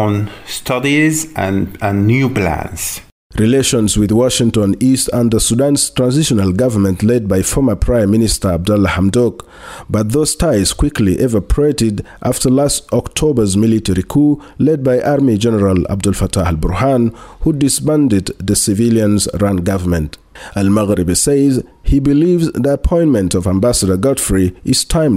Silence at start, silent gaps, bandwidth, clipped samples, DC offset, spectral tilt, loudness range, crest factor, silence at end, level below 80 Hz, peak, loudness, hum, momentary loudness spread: 0 s; 3.12-3.30 s; 16 kHz; under 0.1%; under 0.1%; -5 dB/octave; 2 LU; 12 dB; 0 s; -28 dBFS; -2 dBFS; -14 LUFS; none; 6 LU